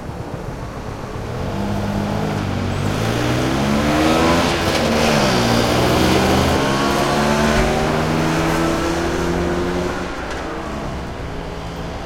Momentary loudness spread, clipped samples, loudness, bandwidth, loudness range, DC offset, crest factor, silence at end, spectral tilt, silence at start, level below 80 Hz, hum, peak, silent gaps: 13 LU; under 0.1%; -18 LUFS; 16.5 kHz; 6 LU; under 0.1%; 16 dB; 0 s; -5 dB/octave; 0 s; -32 dBFS; none; -2 dBFS; none